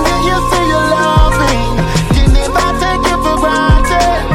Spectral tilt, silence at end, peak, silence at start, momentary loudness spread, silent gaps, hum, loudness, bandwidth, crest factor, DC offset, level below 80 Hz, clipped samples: -5 dB/octave; 0 s; 0 dBFS; 0 s; 3 LU; none; none; -12 LUFS; 16 kHz; 10 dB; under 0.1%; -16 dBFS; under 0.1%